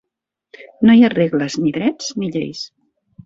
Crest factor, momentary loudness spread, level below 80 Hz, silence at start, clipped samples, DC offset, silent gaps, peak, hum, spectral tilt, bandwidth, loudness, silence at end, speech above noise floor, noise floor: 16 dB; 16 LU; -58 dBFS; 0.6 s; under 0.1%; under 0.1%; none; -2 dBFS; none; -5.5 dB/octave; 7.6 kHz; -16 LUFS; 0.6 s; 64 dB; -80 dBFS